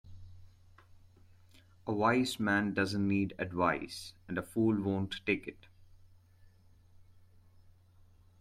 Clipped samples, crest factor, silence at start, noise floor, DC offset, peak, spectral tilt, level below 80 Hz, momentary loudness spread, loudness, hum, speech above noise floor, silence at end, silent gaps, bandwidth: under 0.1%; 20 dB; 0.05 s; -62 dBFS; under 0.1%; -16 dBFS; -6 dB/octave; -64 dBFS; 14 LU; -33 LUFS; none; 29 dB; 1.4 s; none; 15.5 kHz